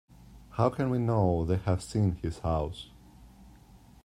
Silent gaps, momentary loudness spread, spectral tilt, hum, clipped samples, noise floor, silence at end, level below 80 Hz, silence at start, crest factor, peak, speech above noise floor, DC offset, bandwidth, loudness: none; 12 LU; -8 dB/octave; none; under 0.1%; -55 dBFS; 0.3 s; -48 dBFS; 0.3 s; 20 dB; -10 dBFS; 27 dB; under 0.1%; 12 kHz; -30 LUFS